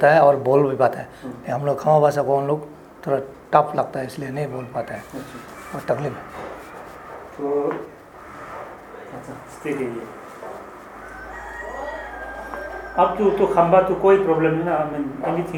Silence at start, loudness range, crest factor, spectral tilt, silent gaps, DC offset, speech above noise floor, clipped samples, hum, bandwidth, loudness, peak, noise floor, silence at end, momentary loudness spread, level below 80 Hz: 0 s; 13 LU; 20 dB; -7.5 dB/octave; none; under 0.1%; 20 dB; under 0.1%; none; 18 kHz; -21 LUFS; -2 dBFS; -40 dBFS; 0 s; 21 LU; -50 dBFS